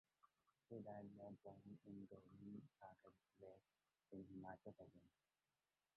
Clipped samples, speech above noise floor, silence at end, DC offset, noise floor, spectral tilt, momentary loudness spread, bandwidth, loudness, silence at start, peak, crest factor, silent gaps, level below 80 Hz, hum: under 0.1%; over 29 dB; 0.9 s; under 0.1%; under -90 dBFS; -8.5 dB/octave; 9 LU; 4.2 kHz; -61 LUFS; 0.25 s; -44 dBFS; 18 dB; none; -86 dBFS; none